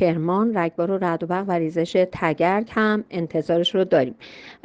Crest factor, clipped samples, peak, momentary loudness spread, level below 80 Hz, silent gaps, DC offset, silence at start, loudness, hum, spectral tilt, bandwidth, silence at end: 16 dB; under 0.1%; -6 dBFS; 5 LU; -58 dBFS; none; under 0.1%; 0 s; -22 LUFS; none; -7 dB/octave; 8.8 kHz; 0.1 s